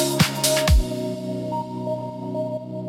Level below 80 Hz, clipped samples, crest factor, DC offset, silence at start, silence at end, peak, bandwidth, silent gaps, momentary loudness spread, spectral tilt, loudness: -28 dBFS; under 0.1%; 18 dB; under 0.1%; 0 s; 0 s; -6 dBFS; 17 kHz; none; 10 LU; -4.5 dB/octave; -23 LUFS